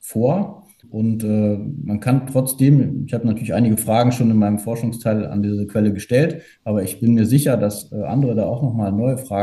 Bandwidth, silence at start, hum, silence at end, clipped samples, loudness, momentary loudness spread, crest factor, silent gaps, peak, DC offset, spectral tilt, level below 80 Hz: 13 kHz; 0.05 s; none; 0 s; under 0.1%; -19 LUFS; 8 LU; 16 dB; none; -2 dBFS; under 0.1%; -7 dB/octave; -54 dBFS